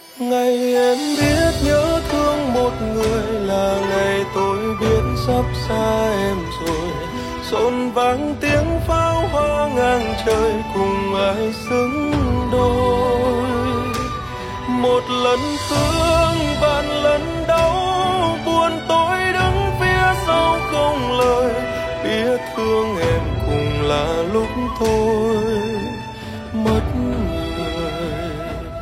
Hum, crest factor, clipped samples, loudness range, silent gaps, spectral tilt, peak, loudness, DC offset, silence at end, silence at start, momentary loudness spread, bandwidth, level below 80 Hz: none; 14 dB; under 0.1%; 3 LU; none; -5.5 dB/octave; -4 dBFS; -19 LUFS; under 0.1%; 0 s; 0 s; 7 LU; 16.5 kHz; -32 dBFS